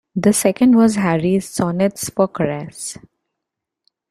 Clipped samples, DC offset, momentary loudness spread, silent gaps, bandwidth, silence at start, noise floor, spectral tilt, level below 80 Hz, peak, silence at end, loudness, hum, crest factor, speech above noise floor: under 0.1%; under 0.1%; 15 LU; none; 14.5 kHz; 0.15 s; -81 dBFS; -5.5 dB/octave; -54 dBFS; 0 dBFS; 1.2 s; -17 LUFS; none; 18 dB; 65 dB